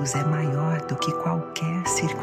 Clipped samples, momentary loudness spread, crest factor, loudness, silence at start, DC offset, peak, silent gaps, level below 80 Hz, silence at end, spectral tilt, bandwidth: under 0.1%; 3 LU; 16 dB; -25 LUFS; 0 s; under 0.1%; -8 dBFS; none; -58 dBFS; 0 s; -5 dB/octave; 15 kHz